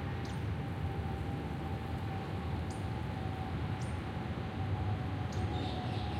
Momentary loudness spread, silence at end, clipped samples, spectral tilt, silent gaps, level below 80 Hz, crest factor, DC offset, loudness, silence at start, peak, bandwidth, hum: 3 LU; 0 s; under 0.1%; -7 dB/octave; none; -46 dBFS; 12 dB; under 0.1%; -38 LUFS; 0 s; -24 dBFS; 13.5 kHz; none